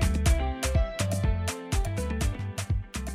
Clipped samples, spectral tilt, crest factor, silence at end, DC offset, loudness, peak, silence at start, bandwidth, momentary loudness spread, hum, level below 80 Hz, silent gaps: under 0.1%; -5 dB/octave; 14 dB; 0 s; under 0.1%; -29 LUFS; -12 dBFS; 0 s; 15.5 kHz; 6 LU; none; -30 dBFS; none